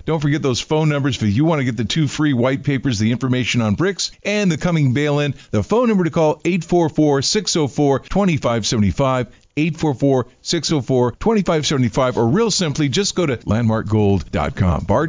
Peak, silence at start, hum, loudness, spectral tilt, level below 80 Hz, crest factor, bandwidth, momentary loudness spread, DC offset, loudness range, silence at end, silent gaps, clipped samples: -6 dBFS; 0.05 s; none; -18 LUFS; -5.5 dB/octave; -38 dBFS; 10 dB; 7.6 kHz; 4 LU; under 0.1%; 1 LU; 0 s; none; under 0.1%